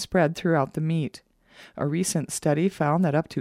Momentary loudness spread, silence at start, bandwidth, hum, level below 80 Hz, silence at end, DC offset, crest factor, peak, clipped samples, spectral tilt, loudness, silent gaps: 7 LU; 0 s; 15.5 kHz; none; -58 dBFS; 0 s; under 0.1%; 16 dB; -10 dBFS; under 0.1%; -6 dB/octave; -25 LUFS; none